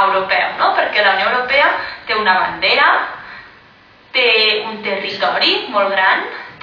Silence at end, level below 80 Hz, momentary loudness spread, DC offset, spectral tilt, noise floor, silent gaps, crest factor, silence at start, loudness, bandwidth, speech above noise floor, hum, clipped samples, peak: 0.05 s; -56 dBFS; 9 LU; under 0.1%; -4 dB/octave; -46 dBFS; none; 14 dB; 0 s; -14 LUFS; 5.4 kHz; 30 dB; none; under 0.1%; -2 dBFS